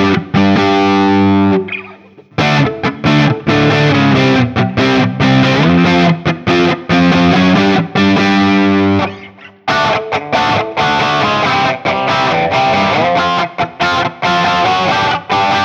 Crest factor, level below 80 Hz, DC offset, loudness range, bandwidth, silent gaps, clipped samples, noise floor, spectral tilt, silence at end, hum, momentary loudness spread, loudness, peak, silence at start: 12 dB; -42 dBFS; under 0.1%; 2 LU; 7.8 kHz; none; under 0.1%; -38 dBFS; -6 dB/octave; 0 s; none; 6 LU; -11 LUFS; 0 dBFS; 0 s